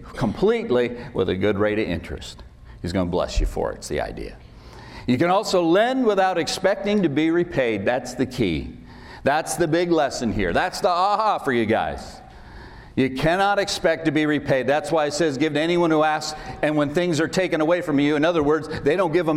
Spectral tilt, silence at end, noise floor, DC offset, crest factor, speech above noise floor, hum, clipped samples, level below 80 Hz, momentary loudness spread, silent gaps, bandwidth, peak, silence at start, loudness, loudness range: -5.5 dB/octave; 0 s; -41 dBFS; under 0.1%; 14 dB; 20 dB; none; under 0.1%; -38 dBFS; 10 LU; none; 15.5 kHz; -8 dBFS; 0 s; -22 LUFS; 4 LU